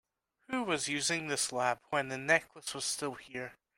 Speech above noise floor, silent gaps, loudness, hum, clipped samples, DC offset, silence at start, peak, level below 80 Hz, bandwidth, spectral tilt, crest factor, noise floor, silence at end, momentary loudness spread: 21 dB; none; -33 LUFS; none; under 0.1%; under 0.1%; 0.5 s; -12 dBFS; -74 dBFS; 16 kHz; -2 dB/octave; 22 dB; -55 dBFS; 0.25 s; 12 LU